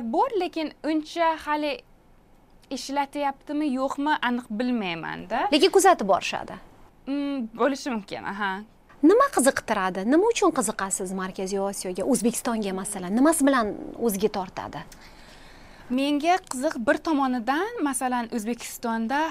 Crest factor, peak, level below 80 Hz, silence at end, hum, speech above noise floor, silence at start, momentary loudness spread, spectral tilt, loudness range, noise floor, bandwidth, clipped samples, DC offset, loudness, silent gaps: 20 dB; -6 dBFS; -54 dBFS; 0 s; none; 30 dB; 0 s; 12 LU; -3.5 dB/octave; 5 LU; -55 dBFS; 16 kHz; under 0.1%; under 0.1%; -25 LUFS; none